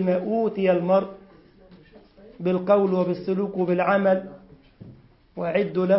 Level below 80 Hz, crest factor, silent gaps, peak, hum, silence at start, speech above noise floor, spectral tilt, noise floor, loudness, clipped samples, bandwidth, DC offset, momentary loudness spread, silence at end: -62 dBFS; 16 dB; none; -6 dBFS; none; 0 s; 30 dB; -12 dB/octave; -51 dBFS; -23 LUFS; under 0.1%; 5.8 kHz; under 0.1%; 10 LU; 0 s